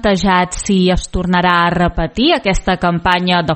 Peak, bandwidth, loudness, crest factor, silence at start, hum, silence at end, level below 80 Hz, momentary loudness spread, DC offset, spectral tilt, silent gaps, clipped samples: 0 dBFS; 8.8 kHz; -14 LUFS; 14 dB; 0 s; none; 0 s; -26 dBFS; 4 LU; under 0.1%; -5 dB/octave; none; under 0.1%